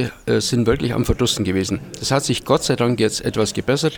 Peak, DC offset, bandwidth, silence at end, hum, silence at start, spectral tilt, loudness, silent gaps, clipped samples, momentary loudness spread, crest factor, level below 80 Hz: -2 dBFS; under 0.1%; 20 kHz; 0 s; none; 0 s; -4.5 dB/octave; -19 LUFS; none; under 0.1%; 3 LU; 18 dB; -38 dBFS